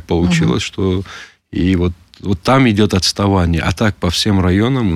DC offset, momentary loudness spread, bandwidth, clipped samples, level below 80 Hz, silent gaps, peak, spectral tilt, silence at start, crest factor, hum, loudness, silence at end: under 0.1%; 10 LU; 14.5 kHz; under 0.1%; -32 dBFS; none; -2 dBFS; -5.5 dB/octave; 0.1 s; 12 dB; none; -15 LUFS; 0 s